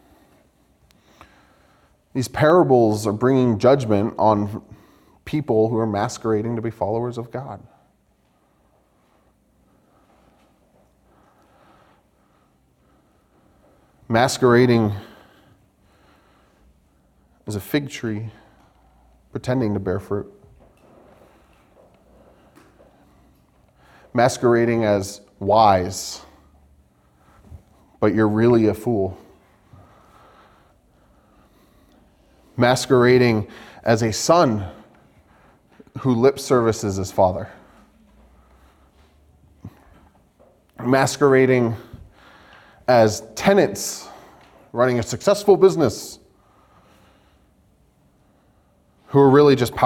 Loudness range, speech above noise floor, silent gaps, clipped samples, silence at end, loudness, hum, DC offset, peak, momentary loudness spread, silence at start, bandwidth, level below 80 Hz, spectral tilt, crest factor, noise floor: 12 LU; 44 dB; none; under 0.1%; 0 s; -19 LUFS; none; under 0.1%; -2 dBFS; 17 LU; 2.15 s; 16.5 kHz; -56 dBFS; -6 dB/octave; 20 dB; -62 dBFS